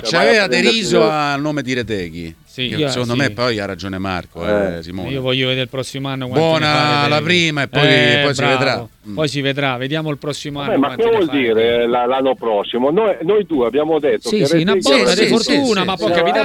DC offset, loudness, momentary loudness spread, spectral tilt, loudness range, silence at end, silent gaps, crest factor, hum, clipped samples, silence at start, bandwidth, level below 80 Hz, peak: under 0.1%; -16 LUFS; 11 LU; -4.5 dB/octave; 6 LU; 0 s; none; 16 dB; none; under 0.1%; 0 s; 16.5 kHz; -48 dBFS; 0 dBFS